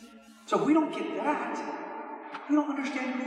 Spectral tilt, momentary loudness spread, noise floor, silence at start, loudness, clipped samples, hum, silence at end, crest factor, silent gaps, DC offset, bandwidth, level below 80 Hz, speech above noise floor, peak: -5.5 dB/octave; 15 LU; -50 dBFS; 0 s; -30 LUFS; under 0.1%; none; 0 s; 16 dB; none; under 0.1%; 10 kHz; -82 dBFS; 22 dB; -14 dBFS